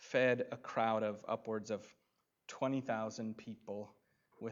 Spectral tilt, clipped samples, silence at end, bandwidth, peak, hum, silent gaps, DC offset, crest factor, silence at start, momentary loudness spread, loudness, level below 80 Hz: -5.5 dB/octave; under 0.1%; 0 s; 7.6 kHz; -18 dBFS; none; none; under 0.1%; 20 dB; 0 s; 15 LU; -39 LUFS; -88 dBFS